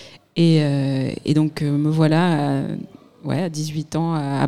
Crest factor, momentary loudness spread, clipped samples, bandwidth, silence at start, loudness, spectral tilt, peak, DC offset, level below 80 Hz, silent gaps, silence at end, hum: 14 dB; 12 LU; under 0.1%; 12 kHz; 0 s; -20 LUFS; -7 dB/octave; -6 dBFS; 0.3%; -58 dBFS; none; 0 s; none